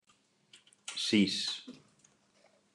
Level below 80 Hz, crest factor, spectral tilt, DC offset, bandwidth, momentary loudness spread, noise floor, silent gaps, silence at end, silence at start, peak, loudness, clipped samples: -84 dBFS; 22 dB; -4 dB/octave; under 0.1%; 12 kHz; 19 LU; -70 dBFS; none; 1 s; 0.9 s; -16 dBFS; -32 LUFS; under 0.1%